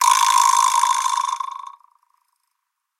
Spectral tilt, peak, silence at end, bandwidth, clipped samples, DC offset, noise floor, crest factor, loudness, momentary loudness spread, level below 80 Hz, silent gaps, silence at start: 8.5 dB/octave; -2 dBFS; 1.3 s; 17 kHz; under 0.1%; under 0.1%; -77 dBFS; 18 dB; -17 LUFS; 15 LU; under -90 dBFS; none; 0 s